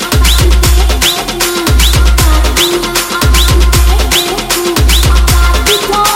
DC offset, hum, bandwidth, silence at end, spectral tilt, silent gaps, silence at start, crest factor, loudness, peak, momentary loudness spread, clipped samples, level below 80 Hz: under 0.1%; none; 17 kHz; 0 s; -3.5 dB/octave; none; 0 s; 8 dB; -9 LUFS; 0 dBFS; 3 LU; 0.3%; -10 dBFS